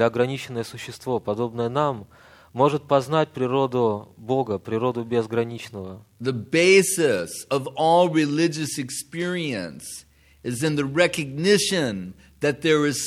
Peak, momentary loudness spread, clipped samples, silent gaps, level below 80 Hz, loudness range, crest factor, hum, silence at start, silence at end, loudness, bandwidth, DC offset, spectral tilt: -4 dBFS; 15 LU; under 0.1%; none; -60 dBFS; 4 LU; 18 dB; none; 0 s; 0 s; -23 LUFS; 15.5 kHz; under 0.1%; -4.5 dB/octave